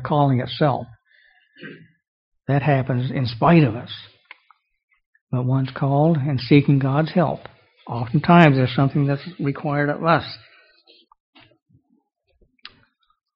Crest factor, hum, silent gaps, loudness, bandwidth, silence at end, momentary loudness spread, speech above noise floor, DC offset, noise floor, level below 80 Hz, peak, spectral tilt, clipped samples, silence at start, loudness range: 22 dB; none; 2.08-2.32 s, 4.83-4.88 s, 5.06-5.13 s, 5.21-5.27 s; -19 LUFS; 5.6 kHz; 3 s; 20 LU; 47 dB; under 0.1%; -66 dBFS; -54 dBFS; 0 dBFS; -6.5 dB/octave; under 0.1%; 0 s; 7 LU